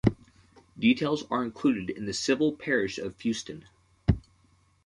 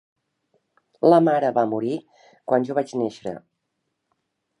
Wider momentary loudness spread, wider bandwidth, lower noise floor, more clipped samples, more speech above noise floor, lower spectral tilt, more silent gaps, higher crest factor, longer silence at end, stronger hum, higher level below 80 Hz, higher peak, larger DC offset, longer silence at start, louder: second, 8 LU vs 18 LU; about the same, 11 kHz vs 11 kHz; second, -64 dBFS vs -77 dBFS; neither; second, 36 dB vs 57 dB; second, -5.5 dB/octave vs -7.5 dB/octave; neither; about the same, 24 dB vs 20 dB; second, 0.65 s vs 1.2 s; neither; first, -46 dBFS vs -72 dBFS; about the same, -6 dBFS vs -4 dBFS; neither; second, 0.05 s vs 1.05 s; second, -28 LUFS vs -21 LUFS